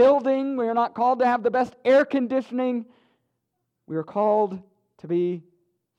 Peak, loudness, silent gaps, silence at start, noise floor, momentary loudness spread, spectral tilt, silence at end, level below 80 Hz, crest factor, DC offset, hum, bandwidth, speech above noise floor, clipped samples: -8 dBFS; -23 LUFS; none; 0 s; -78 dBFS; 12 LU; -7.5 dB/octave; 0.6 s; -72 dBFS; 16 dB; under 0.1%; none; 7.6 kHz; 56 dB; under 0.1%